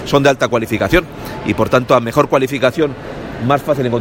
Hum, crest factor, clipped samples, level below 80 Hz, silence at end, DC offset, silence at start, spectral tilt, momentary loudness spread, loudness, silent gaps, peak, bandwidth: none; 14 dB; 0.1%; -36 dBFS; 0 s; under 0.1%; 0 s; -6 dB/octave; 10 LU; -15 LUFS; none; 0 dBFS; 17 kHz